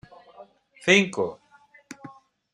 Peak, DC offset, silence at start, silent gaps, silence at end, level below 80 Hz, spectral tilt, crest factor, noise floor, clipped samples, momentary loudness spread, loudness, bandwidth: -4 dBFS; under 0.1%; 0.4 s; none; 0.45 s; -70 dBFS; -3.5 dB/octave; 24 dB; -54 dBFS; under 0.1%; 25 LU; -22 LUFS; 11.5 kHz